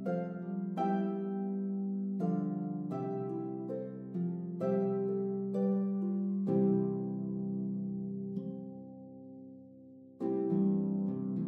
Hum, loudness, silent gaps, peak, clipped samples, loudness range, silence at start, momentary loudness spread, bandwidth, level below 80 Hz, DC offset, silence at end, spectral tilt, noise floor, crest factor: none; -35 LUFS; none; -20 dBFS; under 0.1%; 5 LU; 0 s; 18 LU; 3.3 kHz; -86 dBFS; under 0.1%; 0 s; -11.5 dB/octave; -54 dBFS; 16 dB